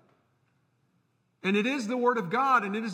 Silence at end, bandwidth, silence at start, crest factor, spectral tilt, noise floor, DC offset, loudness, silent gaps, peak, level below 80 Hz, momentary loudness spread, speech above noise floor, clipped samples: 0 s; 15 kHz; 1.45 s; 18 dB; -5.5 dB/octave; -72 dBFS; under 0.1%; -27 LUFS; none; -12 dBFS; -86 dBFS; 5 LU; 45 dB; under 0.1%